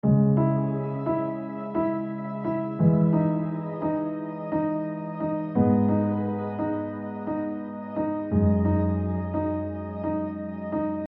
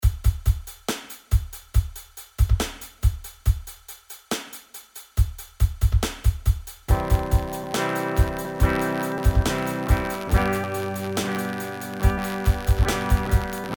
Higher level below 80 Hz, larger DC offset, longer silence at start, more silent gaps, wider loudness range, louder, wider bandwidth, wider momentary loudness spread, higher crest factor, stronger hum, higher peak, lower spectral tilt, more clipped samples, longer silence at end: second, -52 dBFS vs -26 dBFS; neither; about the same, 0.05 s vs 0 s; neither; about the same, 2 LU vs 4 LU; about the same, -26 LUFS vs -25 LUFS; second, 4 kHz vs over 20 kHz; about the same, 10 LU vs 9 LU; about the same, 16 dB vs 18 dB; neither; about the same, -8 dBFS vs -6 dBFS; first, -11 dB/octave vs -5.5 dB/octave; neither; about the same, 0.05 s vs 0.05 s